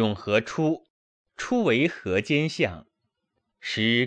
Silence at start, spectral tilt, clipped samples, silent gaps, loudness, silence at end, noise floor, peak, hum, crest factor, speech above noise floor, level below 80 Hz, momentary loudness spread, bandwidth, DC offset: 0 s; -5.5 dB/octave; under 0.1%; 0.90-1.25 s; -25 LUFS; 0 s; -79 dBFS; -8 dBFS; none; 18 dB; 54 dB; -60 dBFS; 11 LU; 9.8 kHz; under 0.1%